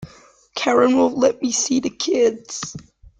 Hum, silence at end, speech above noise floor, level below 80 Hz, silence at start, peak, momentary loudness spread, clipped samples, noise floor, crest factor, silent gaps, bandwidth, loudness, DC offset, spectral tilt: none; 0.1 s; 31 dB; -56 dBFS; 0 s; -2 dBFS; 15 LU; under 0.1%; -50 dBFS; 18 dB; none; 9.4 kHz; -19 LUFS; under 0.1%; -3 dB/octave